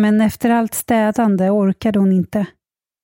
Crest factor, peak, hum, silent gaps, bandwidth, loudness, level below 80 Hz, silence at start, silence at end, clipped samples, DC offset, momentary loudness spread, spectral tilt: 12 dB; -4 dBFS; none; none; 17 kHz; -16 LUFS; -50 dBFS; 0 s; 0.55 s; under 0.1%; under 0.1%; 5 LU; -6.5 dB/octave